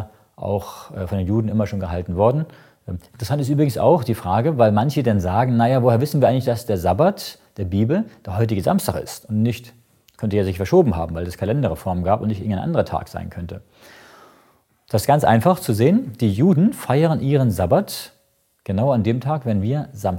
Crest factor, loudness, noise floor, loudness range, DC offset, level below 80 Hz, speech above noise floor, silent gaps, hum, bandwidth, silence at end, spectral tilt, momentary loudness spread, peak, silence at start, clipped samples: 18 dB; -19 LUFS; -63 dBFS; 6 LU; under 0.1%; -46 dBFS; 44 dB; none; none; 17 kHz; 0 s; -7.5 dB/octave; 15 LU; -2 dBFS; 0 s; under 0.1%